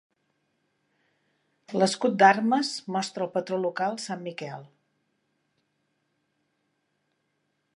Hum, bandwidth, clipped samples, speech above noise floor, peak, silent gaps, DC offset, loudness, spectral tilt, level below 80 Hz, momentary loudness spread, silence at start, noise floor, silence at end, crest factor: none; 11 kHz; under 0.1%; 50 dB; -6 dBFS; none; under 0.1%; -25 LUFS; -4.5 dB/octave; -86 dBFS; 17 LU; 1.7 s; -76 dBFS; 3.1 s; 24 dB